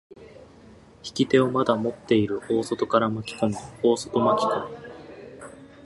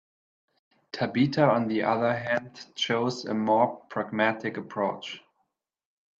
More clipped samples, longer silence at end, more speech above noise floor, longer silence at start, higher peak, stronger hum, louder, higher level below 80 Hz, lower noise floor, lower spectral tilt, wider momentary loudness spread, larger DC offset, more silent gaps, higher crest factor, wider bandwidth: neither; second, 0 s vs 1 s; second, 26 dB vs 51 dB; second, 0.2 s vs 0.95 s; about the same, -6 dBFS vs -6 dBFS; neither; first, -24 LUFS vs -27 LUFS; first, -60 dBFS vs -70 dBFS; second, -50 dBFS vs -78 dBFS; about the same, -6 dB/octave vs -6 dB/octave; first, 21 LU vs 13 LU; neither; neither; about the same, 20 dB vs 22 dB; first, 11.5 kHz vs 7.8 kHz